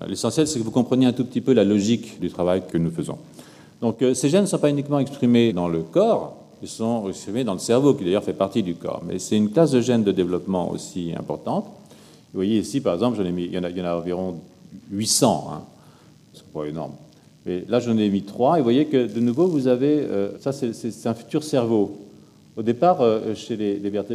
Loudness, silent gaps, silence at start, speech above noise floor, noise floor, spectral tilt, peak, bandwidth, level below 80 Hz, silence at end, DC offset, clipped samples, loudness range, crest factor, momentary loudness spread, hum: -22 LUFS; none; 0 s; 29 dB; -50 dBFS; -5.5 dB/octave; -2 dBFS; 15 kHz; -60 dBFS; 0 s; under 0.1%; under 0.1%; 5 LU; 20 dB; 12 LU; none